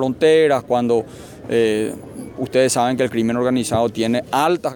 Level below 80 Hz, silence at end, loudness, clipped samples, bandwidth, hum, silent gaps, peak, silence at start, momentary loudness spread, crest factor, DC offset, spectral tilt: -52 dBFS; 0 s; -18 LUFS; under 0.1%; 19 kHz; none; none; -4 dBFS; 0 s; 13 LU; 14 dB; under 0.1%; -5 dB/octave